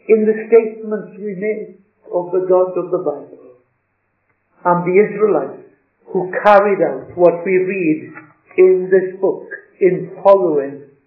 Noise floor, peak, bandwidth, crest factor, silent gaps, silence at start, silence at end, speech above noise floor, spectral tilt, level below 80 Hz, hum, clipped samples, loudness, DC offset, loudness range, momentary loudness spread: -67 dBFS; 0 dBFS; 5.4 kHz; 16 dB; none; 0.1 s; 0.25 s; 52 dB; -10 dB/octave; -66 dBFS; none; under 0.1%; -16 LUFS; under 0.1%; 6 LU; 15 LU